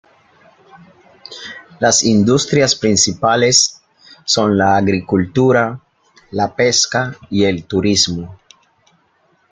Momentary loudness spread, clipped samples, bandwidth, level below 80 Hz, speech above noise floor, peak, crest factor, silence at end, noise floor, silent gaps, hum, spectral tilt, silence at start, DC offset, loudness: 17 LU; under 0.1%; 11 kHz; -52 dBFS; 44 dB; 0 dBFS; 16 dB; 1.15 s; -58 dBFS; none; none; -3.5 dB/octave; 1.3 s; under 0.1%; -14 LUFS